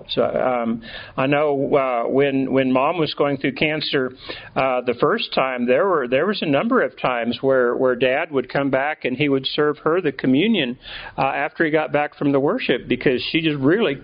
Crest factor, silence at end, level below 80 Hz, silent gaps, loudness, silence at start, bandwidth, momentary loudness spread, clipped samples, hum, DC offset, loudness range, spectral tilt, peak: 18 dB; 0 s; -54 dBFS; none; -20 LUFS; 0 s; 5.2 kHz; 5 LU; under 0.1%; none; under 0.1%; 1 LU; -3.5 dB/octave; -2 dBFS